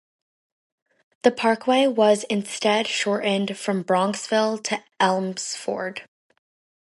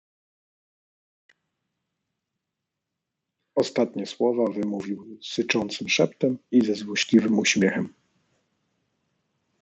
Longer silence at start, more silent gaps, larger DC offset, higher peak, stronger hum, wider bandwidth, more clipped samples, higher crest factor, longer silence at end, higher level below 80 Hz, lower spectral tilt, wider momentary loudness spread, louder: second, 1.25 s vs 3.55 s; neither; neither; first, -2 dBFS vs -6 dBFS; neither; first, 11.5 kHz vs 8.2 kHz; neither; about the same, 22 dB vs 22 dB; second, 0.85 s vs 1.75 s; about the same, -74 dBFS vs -72 dBFS; about the same, -4 dB/octave vs -4.5 dB/octave; about the same, 9 LU vs 11 LU; about the same, -22 LUFS vs -24 LUFS